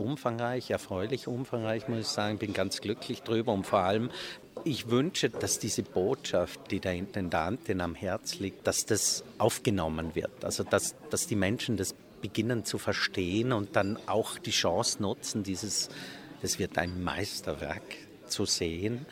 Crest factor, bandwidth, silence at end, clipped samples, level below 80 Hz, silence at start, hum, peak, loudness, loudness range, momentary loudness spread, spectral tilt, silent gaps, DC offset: 22 dB; 18 kHz; 0 s; under 0.1%; -58 dBFS; 0 s; none; -8 dBFS; -31 LUFS; 3 LU; 8 LU; -4 dB/octave; none; under 0.1%